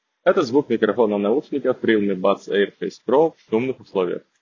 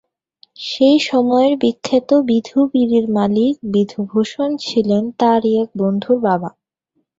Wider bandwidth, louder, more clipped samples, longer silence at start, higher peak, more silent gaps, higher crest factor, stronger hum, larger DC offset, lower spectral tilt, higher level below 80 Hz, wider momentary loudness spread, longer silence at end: about the same, 7.4 kHz vs 7.8 kHz; second, -21 LUFS vs -16 LUFS; neither; second, 0.25 s vs 0.6 s; about the same, -2 dBFS vs -2 dBFS; neither; about the same, 18 dB vs 14 dB; neither; neither; about the same, -6.5 dB/octave vs -6.5 dB/octave; second, -66 dBFS vs -58 dBFS; about the same, 6 LU vs 6 LU; second, 0.25 s vs 0.7 s